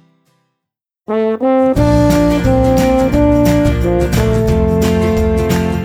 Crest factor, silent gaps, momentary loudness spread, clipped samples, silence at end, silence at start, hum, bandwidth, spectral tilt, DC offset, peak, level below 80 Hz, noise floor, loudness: 12 dB; none; 4 LU; under 0.1%; 0 s; 1.1 s; none; 19 kHz; -7 dB/octave; under 0.1%; 0 dBFS; -22 dBFS; -79 dBFS; -13 LUFS